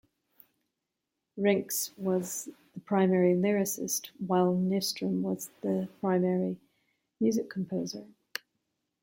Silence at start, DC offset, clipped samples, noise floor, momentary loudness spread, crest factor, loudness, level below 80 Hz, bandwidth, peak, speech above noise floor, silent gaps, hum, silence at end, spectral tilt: 1.35 s; under 0.1%; under 0.1%; -86 dBFS; 16 LU; 18 dB; -30 LUFS; -74 dBFS; 16.5 kHz; -12 dBFS; 56 dB; none; none; 0.95 s; -5 dB/octave